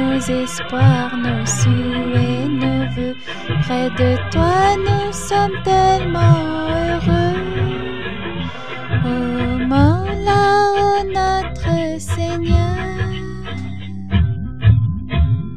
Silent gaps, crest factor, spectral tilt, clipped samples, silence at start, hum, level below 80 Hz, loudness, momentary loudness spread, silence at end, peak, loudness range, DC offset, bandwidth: none; 16 dB; -6 dB/octave; under 0.1%; 0 s; none; -30 dBFS; -18 LUFS; 11 LU; 0 s; 0 dBFS; 4 LU; 3%; 12.5 kHz